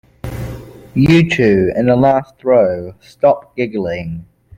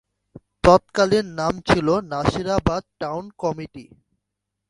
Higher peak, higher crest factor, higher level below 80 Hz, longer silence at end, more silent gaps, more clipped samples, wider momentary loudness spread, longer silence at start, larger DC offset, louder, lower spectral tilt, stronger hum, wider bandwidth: about the same, -2 dBFS vs 0 dBFS; second, 14 dB vs 22 dB; about the same, -40 dBFS vs -40 dBFS; second, 0.35 s vs 0.85 s; neither; neither; first, 18 LU vs 13 LU; about the same, 0.25 s vs 0.35 s; neither; first, -14 LUFS vs -21 LUFS; first, -7.5 dB/octave vs -6 dB/octave; neither; first, 16 kHz vs 11.5 kHz